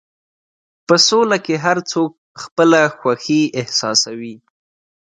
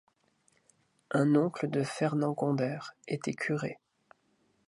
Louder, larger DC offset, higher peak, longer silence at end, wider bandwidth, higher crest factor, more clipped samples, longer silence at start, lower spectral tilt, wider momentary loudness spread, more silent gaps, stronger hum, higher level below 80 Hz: first, -15 LUFS vs -31 LUFS; neither; first, 0 dBFS vs -14 dBFS; second, 0.65 s vs 0.95 s; second, 9.4 kHz vs 11.5 kHz; about the same, 18 dB vs 20 dB; neither; second, 0.9 s vs 1.1 s; second, -3 dB/octave vs -7 dB/octave; first, 15 LU vs 12 LU; first, 2.18-2.35 s, 2.52-2.56 s vs none; neither; first, -66 dBFS vs -78 dBFS